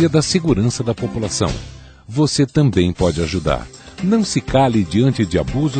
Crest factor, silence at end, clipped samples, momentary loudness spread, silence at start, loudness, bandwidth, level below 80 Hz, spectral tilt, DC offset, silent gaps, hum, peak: 14 dB; 0 s; under 0.1%; 8 LU; 0 s; -17 LUFS; 9.2 kHz; -34 dBFS; -6 dB/octave; under 0.1%; none; none; -2 dBFS